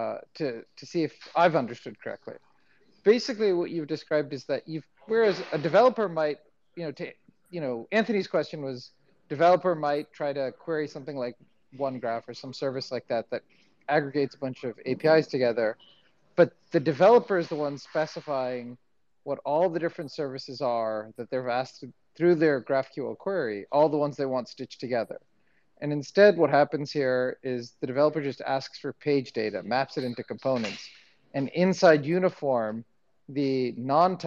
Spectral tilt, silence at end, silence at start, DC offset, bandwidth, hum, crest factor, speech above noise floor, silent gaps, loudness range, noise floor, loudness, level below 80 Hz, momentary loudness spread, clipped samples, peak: -6.5 dB/octave; 0 s; 0 s; under 0.1%; 7.6 kHz; none; 20 dB; 42 dB; none; 6 LU; -69 dBFS; -27 LUFS; -80 dBFS; 16 LU; under 0.1%; -6 dBFS